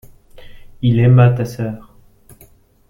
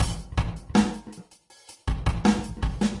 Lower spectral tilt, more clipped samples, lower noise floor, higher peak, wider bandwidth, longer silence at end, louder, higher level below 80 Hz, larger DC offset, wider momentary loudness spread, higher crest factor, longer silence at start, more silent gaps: first, -8.5 dB/octave vs -6 dB/octave; neither; second, -48 dBFS vs -52 dBFS; first, -2 dBFS vs -6 dBFS; about the same, 11 kHz vs 11.5 kHz; first, 1.1 s vs 0 s; first, -14 LUFS vs -27 LUFS; second, -44 dBFS vs -34 dBFS; neither; about the same, 15 LU vs 15 LU; about the same, 16 dB vs 20 dB; first, 0.35 s vs 0 s; neither